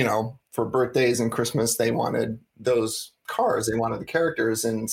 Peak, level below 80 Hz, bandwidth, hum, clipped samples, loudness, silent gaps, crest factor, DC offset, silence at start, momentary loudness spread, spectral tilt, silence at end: -8 dBFS; -58 dBFS; 17 kHz; none; under 0.1%; -25 LUFS; none; 16 dB; under 0.1%; 0 s; 8 LU; -4.5 dB/octave; 0 s